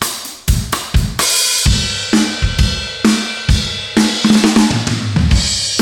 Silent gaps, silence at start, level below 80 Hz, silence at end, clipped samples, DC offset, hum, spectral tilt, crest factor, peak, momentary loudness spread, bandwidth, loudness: none; 0 s; -22 dBFS; 0 s; under 0.1%; under 0.1%; none; -3.5 dB/octave; 14 dB; 0 dBFS; 6 LU; 18 kHz; -14 LUFS